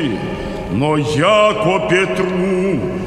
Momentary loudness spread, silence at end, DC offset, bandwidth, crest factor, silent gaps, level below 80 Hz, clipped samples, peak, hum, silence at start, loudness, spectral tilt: 10 LU; 0 s; under 0.1%; 12.5 kHz; 14 dB; none; -38 dBFS; under 0.1%; 0 dBFS; none; 0 s; -16 LUFS; -6 dB/octave